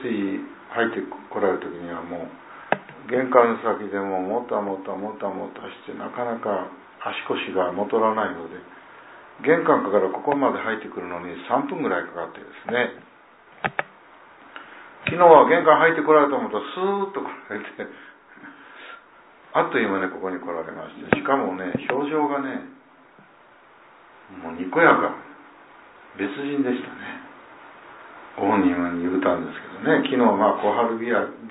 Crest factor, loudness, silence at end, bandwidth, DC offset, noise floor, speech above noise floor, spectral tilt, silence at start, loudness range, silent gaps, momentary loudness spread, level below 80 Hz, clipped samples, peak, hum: 22 dB; -22 LUFS; 0 s; 4 kHz; under 0.1%; -52 dBFS; 30 dB; -9.5 dB/octave; 0 s; 10 LU; none; 20 LU; -66 dBFS; under 0.1%; 0 dBFS; none